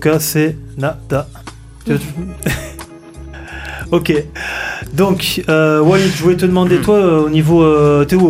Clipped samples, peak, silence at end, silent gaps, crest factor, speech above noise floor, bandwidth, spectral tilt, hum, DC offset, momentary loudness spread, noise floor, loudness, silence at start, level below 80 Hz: under 0.1%; -2 dBFS; 0 s; none; 12 dB; 20 dB; 15.5 kHz; -6 dB/octave; none; under 0.1%; 20 LU; -33 dBFS; -14 LUFS; 0 s; -34 dBFS